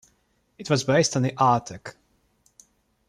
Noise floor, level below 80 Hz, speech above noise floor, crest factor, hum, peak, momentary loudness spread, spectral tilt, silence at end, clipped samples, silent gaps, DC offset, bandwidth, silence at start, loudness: -68 dBFS; -62 dBFS; 45 dB; 20 dB; none; -6 dBFS; 20 LU; -5 dB/octave; 1.2 s; under 0.1%; none; under 0.1%; 13 kHz; 0.6 s; -22 LUFS